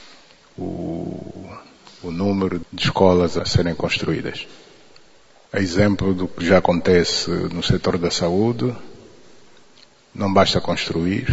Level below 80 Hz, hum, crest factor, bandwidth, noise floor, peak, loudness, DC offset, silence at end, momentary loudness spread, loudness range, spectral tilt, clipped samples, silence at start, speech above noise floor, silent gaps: -44 dBFS; none; 20 dB; 8 kHz; -52 dBFS; 0 dBFS; -20 LUFS; under 0.1%; 0 s; 17 LU; 4 LU; -5.5 dB/octave; under 0.1%; 0 s; 33 dB; none